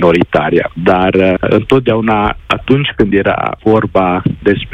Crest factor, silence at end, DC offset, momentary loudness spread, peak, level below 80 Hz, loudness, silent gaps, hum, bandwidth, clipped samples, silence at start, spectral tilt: 12 dB; 0 s; under 0.1%; 4 LU; 0 dBFS; -34 dBFS; -12 LUFS; none; none; 9.2 kHz; 0.2%; 0 s; -8 dB/octave